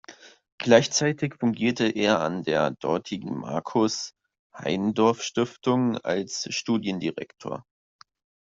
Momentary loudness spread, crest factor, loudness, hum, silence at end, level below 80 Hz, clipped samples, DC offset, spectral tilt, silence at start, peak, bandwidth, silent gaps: 12 LU; 22 dB; -25 LUFS; none; 0.8 s; -64 dBFS; under 0.1%; under 0.1%; -4.5 dB/octave; 0.1 s; -4 dBFS; 7.8 kHz; 0.52-0.58 s, 4.39-4.50 s